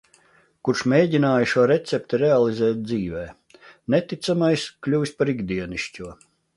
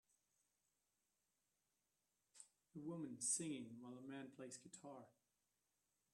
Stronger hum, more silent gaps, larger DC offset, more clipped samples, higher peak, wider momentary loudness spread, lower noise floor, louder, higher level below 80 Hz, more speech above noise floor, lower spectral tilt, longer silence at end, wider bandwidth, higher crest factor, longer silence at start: second, none vs 50 Hz at -85 dBFS; neither; neither; neither; first, -4 dBFS vs -30 dBFS; second, 13 LU vs 20 LU; second, -58 dBFS vs -90 dBFS; first, -22 LUFS vs -49 LUFS; first, -54 dBFS vs under -90 dBFS; about the same, 37 dB vs 38 dB; first, -6 dB/octave vs -3.5 dB/octave; second, 0.45 s vs 1 s; second, 11.5 kHz vs 13 kHz; second, 18 dB vs 26 dB; second, 0.65 s vs 2.35 s